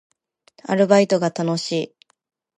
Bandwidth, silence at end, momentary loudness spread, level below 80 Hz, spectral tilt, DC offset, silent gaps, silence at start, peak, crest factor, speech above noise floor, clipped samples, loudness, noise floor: 10.5 kHz; 0.7 s; 15 LU; -72 dBFS; -5.5 dB/octave; under 0.1%; none; 0.7 s; -2 dBFS; 20 dB; 38 dB; under 0.1%; -19 LUFS; -56 dBFS